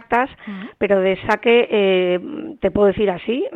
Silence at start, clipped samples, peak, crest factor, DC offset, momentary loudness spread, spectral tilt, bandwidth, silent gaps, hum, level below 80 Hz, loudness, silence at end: 0.1 s; under 0.1%; -2 dBFS; 16 dB; under 0.1%; 11 LU; -7 dB/octave; 6.8 kHz; none; none; -46 dBFS; -18 LUFS; 0 s